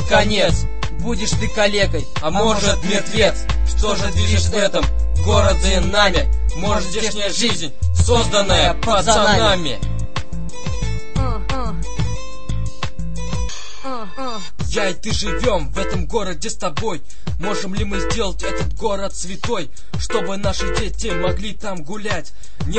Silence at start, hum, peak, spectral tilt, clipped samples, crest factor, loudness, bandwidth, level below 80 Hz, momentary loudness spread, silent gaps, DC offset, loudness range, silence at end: 0 s; none; 0 dBFS; -4 dB/octave; under 0.1%; 18 dB; -20 LUFS; 8.8 kHz; -26 dBFS; 12 LU; none; 10%; 9 LU; 0 s